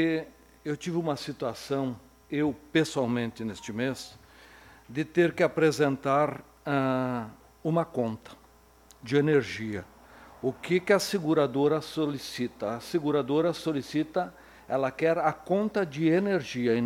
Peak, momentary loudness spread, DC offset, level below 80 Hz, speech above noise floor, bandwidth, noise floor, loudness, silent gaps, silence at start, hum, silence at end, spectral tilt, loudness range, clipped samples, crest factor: -8 dBFS; 12 LU; under 0.1%; -62 dBFS; 30 dB; 16.5 kHz; -57 dBFS; -28 LUFS; none; 0 s; none; 0 s; -6 dB/octave; 3 LU; under 0.1%; 20 dB